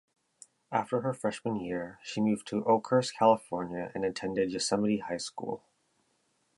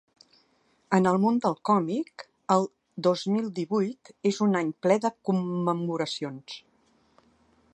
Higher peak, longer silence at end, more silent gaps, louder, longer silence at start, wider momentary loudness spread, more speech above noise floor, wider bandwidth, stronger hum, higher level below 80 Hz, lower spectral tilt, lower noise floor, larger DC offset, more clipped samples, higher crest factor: second, -10 dBFS vs -6 dBFS; second, 1 s vs 1.15 s; neither; second, -31 LUFS vs -27 LUFS; second, 0.7 s vs 0.9 s; about the same, 11 LU vs 12 LU; about the same, 44 dB vs 41 dB; first, 11.5 kHz vs 9.2 kHz; neither; first, -68 dBFS vs -74 dBFS; second, -5 dB/octave vs -6.5 dB/octave; first, -74 dBFS vs -67 dBFS; neither; neither; about the same, 22 dB vs 22 dB